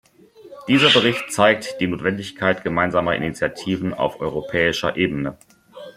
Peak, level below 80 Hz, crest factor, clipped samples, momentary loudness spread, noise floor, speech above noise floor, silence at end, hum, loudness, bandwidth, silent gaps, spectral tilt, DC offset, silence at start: -2 dBFS; -52 dBFS; 20 dB; under 0.1%; 10 LU; -46 dBFS; 26 dB; 0.05 s; none; -20 LUFS; 15.5 kHz; none; -4.5 dB/octave; under 0.1%; 0.4 s